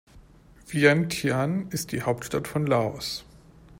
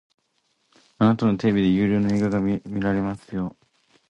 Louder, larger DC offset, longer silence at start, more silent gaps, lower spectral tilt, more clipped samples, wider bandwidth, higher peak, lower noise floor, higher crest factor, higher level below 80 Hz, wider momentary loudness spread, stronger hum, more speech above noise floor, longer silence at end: second, -26 LUFS vs -22 LUFS; neither; second, 0.15 s vs 1 s; neither; second, -5 dB/octave vs -8 dB/octave; neither; first, 16 kHz vs 8 kHz; about the same, -6 dBFS vs -6 dBFS; second, -52 dBFS vs -70 dBFS; about the same, 20 dB vs 16 dB; about the same, -54 dBFS vs -50 dBFS; about the same, 12 LU vs 10 LU; neither; second, 27 dB vs 49 dB; second, 0.05 s vs 0.6 s